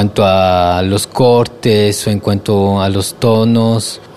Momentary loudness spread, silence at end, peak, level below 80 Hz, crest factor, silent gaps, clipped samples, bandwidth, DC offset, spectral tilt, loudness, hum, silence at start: 5 LU; 0.05 s; 0 dBFS; -42 dBFS; 12 dB; none; under 0.1%; 14 kHz; 0.7%; -5.5 dB/octave; -12 LUFS; none; 0 s